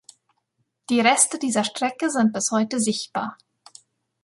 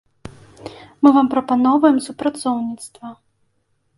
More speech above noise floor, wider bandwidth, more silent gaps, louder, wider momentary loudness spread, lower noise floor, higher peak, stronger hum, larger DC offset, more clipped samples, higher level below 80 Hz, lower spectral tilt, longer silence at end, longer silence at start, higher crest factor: about the same, 52 dB vs 50 dB; about the same, 11.5 kHz vs 11.5 kHz; neither; second, -21 LUFS vs -17 LUFS; second, 10 LU vs 24 LU; first, -73 dBFS vs -66 dBFS; about the same, -2 dBFS vs 0 dBFS; neither; neither; neither; second, -70 dBFS vs -56 dBFS; second, -2.5 dB/octave vs -5 dB/octave; about the same, 0.9 s vs 0.85 s; first, 0.9 s vs 0.25 s; about the same, 22 dB vs 18 dB